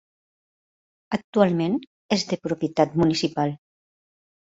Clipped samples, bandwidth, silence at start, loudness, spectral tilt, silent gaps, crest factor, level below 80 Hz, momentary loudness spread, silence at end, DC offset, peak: under 0.1%; 8 kHz; 1.1 s; -24 LUFS; -6 dB/octave; 1.24-1.33 s, 1.87-2.09 s; 20 dB; -58 dBFS; 9 LU; 0.85 s; under 0.1%; -4 dBFS